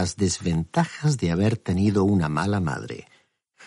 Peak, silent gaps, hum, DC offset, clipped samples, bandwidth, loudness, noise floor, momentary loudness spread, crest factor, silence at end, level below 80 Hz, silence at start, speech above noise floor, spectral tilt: -8 dBFS; none; none; under 0.1%; under 0.1%; 11.5 kHz; -24 LUFS; -60 dBFS; 8 LU; 16 dB; 0 s; -48 dBFS; 0 s; 37 dB; -6 dB/octave